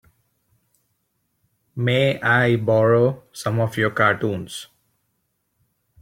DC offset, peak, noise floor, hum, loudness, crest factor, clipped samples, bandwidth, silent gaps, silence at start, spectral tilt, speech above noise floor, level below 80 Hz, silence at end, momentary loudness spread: under 0.1%; -4 dBFS; -72 dBFS; none; -20 LUFS; 18 dB; under 0.1%; 16 kHz; none; 1.75 s; -6 dB/octave; 53 dB; -58 dBFS; 1.4 s; 13 LU